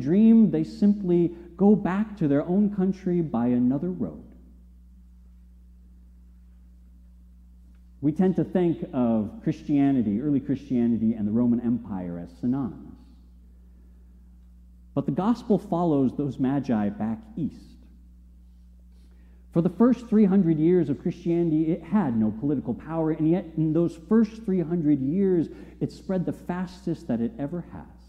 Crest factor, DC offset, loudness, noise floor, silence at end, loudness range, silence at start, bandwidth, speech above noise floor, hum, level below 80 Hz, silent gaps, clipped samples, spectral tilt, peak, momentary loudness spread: 18 dB; under 0.1%; -25 LUFS; -50 dBFS; 0.25 s; 8 LU; 0 s; 6.6 kHz; 27 dB; 60 Hz at -50 dBFS; -50 dBFS; none; under 0.1%; -10 dB/octave; -8 dBFS; 12 LU